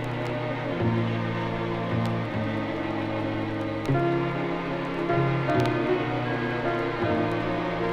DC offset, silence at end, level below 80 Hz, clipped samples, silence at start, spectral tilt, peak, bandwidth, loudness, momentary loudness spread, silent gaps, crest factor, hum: under 0.1%; 0 s; -48 dBFS; under 0.1%; 0 s; -8 dB/octave; -12 dBFS; 10 kHz; -27 LUFS; 5 LU; none; 14 dB; none